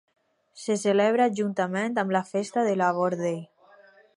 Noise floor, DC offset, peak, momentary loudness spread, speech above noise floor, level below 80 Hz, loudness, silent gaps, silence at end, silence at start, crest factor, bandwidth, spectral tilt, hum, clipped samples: -55 dBFS; under 0.1%; -10 dBFS; 8 LU; 31 dB; -78 dBFS; -25 LUFS; none; 0.7 s; 0.55 s; 18 dB; 11.5 kHz; -5.5 dB/octave; none; under 0.1%